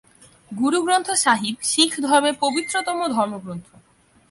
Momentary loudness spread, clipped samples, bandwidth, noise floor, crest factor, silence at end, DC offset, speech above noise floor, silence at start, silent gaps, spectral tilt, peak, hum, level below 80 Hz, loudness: 13 LU; under 0.1%; 11.5 kHz; -57 dBFS; 20 dB; 0.7 s; under 0.1%; 37 dB; 0.5 s; none; -2 dB/octave; -2 dBFS; none; -66 dBFS; -20 LUFS